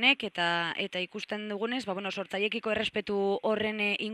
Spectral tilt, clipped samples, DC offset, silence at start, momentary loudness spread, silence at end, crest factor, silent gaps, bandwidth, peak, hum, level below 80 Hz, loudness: -4.5 dB/octave; under 0.1%; under 0.1%; 0 s; 6 LU; 0 s; 22 dB; none; 12 kHz; -10 dBFS; none; -68 dBFS; -30 LUFS